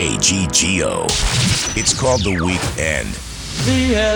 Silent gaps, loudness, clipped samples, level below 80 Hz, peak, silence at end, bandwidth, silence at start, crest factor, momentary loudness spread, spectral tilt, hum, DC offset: none; -16 LUFS; under 0.1%; -28 dBFS; -2 dBFS; 0 s; over 20 kHz; 0 s; 14 dB; 7 LU; -3 dB/octave; none; under 0.1%